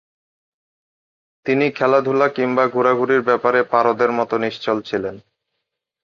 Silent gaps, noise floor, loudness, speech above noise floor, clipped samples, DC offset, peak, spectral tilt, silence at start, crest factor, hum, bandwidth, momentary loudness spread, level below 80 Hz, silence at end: none; -78 dBFS; -18 LUFS; 61 dB; under 0.1%; under 0.1%; -2 dBFS; -6.5 dB/octave; 1.45 s; 18 dB; none; 7 kHz; 7 LU; -62 dBFS; 0.85 s